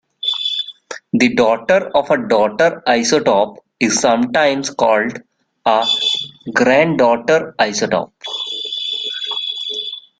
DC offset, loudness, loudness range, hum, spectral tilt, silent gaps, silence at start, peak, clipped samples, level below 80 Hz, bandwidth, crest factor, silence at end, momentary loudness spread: under 0.1%; -16 LUFS; 2 LU; none; -3 dB/octave; none; 0.25 s; 0 dBFS; under 0.1%; -56 dBFS; 9.4 kHz; 16 dB; 0.2 s; 9 LU